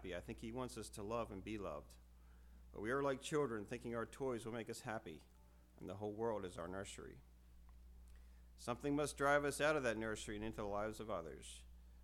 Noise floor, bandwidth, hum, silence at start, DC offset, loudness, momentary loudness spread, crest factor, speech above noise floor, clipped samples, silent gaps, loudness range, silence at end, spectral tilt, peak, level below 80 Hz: -64 dBFS; 17 kHz; none; 0 s; under 0.1%; -44 LUFS; 26 LU; 22 dB; 20 dB; under 0.1%; none; 8 LU; 0 s; -5 dB/octave; -24 dBFS; -62 dBFS